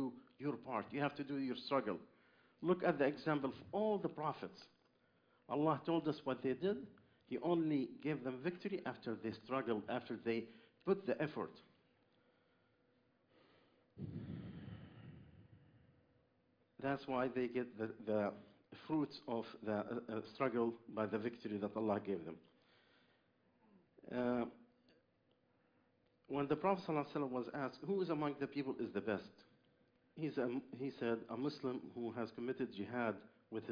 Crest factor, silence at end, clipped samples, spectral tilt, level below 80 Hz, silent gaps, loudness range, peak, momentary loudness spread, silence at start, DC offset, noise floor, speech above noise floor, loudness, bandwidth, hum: 22 dB; 0 s; under 0.1%; -5.5 dB/octave; -78 dBFS; none; 9 LU; -20 dBFS; 12 LU; 0 s; under 0.1%; -78 dBFS; 37 dB; -42 LUFS; 5.2 kHz; none